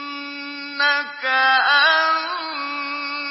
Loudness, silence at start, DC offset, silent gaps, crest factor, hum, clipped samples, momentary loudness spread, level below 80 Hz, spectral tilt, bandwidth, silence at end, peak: -18 LUFS; 0 s; under 0.1%; none; 16 dB; none; under 0.1%; 15 LU; -80 dBFS; -3 dB/octave; 5.8 kHz; 0 s; -4 dBFS